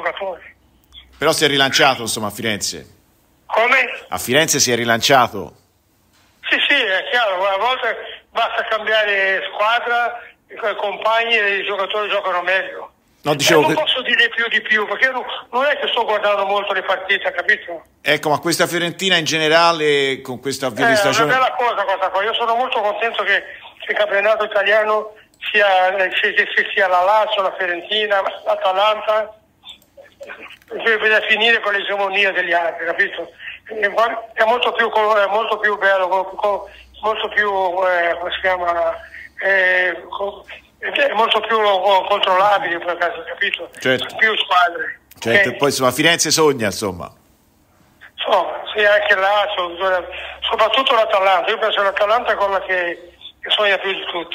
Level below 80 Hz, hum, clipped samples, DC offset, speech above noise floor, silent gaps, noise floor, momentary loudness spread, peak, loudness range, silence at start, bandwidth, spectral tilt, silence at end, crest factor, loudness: -56 dBFS; none; under 0.1%; under 0.1%; 41 dB; none; -58 dBFS; 11 LU; 0 dBFS; 3 LU; 0 s; 16 kHz; -2 dB/octave; 0 s; 18 dB; -16 LUFS